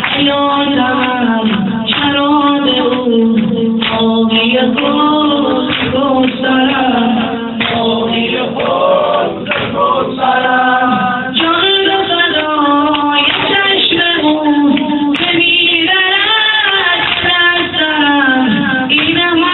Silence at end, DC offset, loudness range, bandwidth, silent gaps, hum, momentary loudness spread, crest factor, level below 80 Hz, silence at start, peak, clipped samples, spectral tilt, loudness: 0 s; under 0.1%; 3 LU; 4.3 kHz; none; none; 5 LU; 10 dB; -46 dBFS; 0 s; 0 dBFS; under 0.1%; -1.5 dB/octave; -11 LUFS